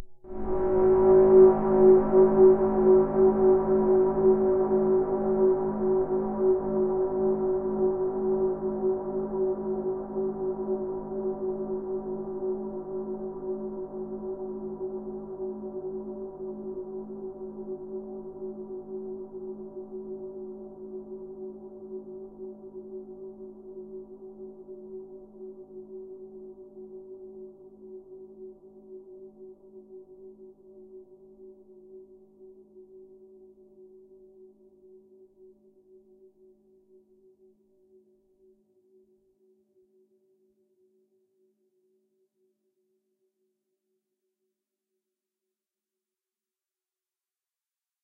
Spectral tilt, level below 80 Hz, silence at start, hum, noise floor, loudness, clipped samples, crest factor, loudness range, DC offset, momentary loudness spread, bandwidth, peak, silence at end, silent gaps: -13 dB/octave; -52 dBFS; 0 s; none; under -90 dBFS; -25 LUFS; under 0.1%; 22 dB; 26 LU; under 0.1%; 25 LU; 2.3 kHz; -8 dBFS; 13.55 s; none